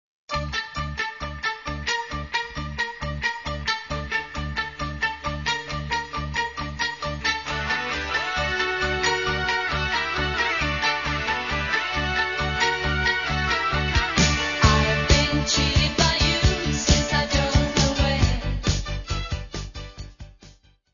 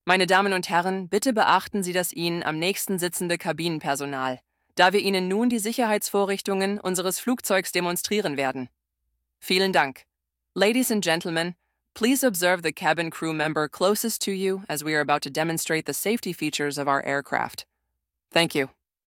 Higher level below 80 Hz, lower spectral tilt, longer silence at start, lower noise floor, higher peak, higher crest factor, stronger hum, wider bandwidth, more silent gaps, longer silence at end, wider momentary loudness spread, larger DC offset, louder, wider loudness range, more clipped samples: first, -32 dBFS vs -70 dBFS; about the same, -3.5 dB/octave vs -3.5 dB/octave; first, 0.3 s vs 0.05 s; second, -52 dBFS vs -81 dBFS; about the same, -2 dBFS vs -2 dBFS; about the same, 22 dB vs 22 dB; neither; second, 7.4 kHz vs 18 kHz; neither; about the same, 0.4 s vs 0.45 s; first, 10 LU vs 7 LU; first, 0.2% vs under 0.1%; about the same, -23 LUFS vs -24 LUFS; first, 7 LU vs 2 LU; neither